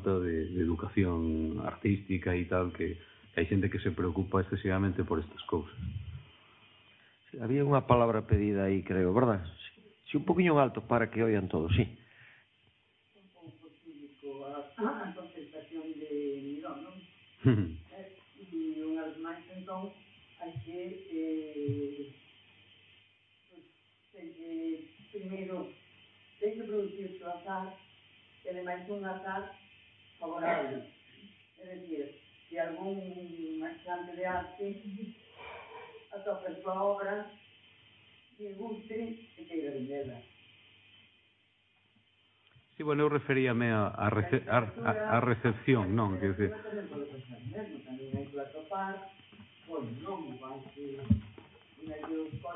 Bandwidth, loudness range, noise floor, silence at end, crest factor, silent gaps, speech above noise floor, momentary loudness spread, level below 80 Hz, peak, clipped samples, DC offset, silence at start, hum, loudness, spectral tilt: 4 kHz; 13 LU; -70 dBFS; 0 s; 24 dB; none; 38 dB; 19 LU; -56 dBFS; -10 dBFS; under 0.1%; under 0.1%; 0 s; none; -34 LUFS; -11 dB/octave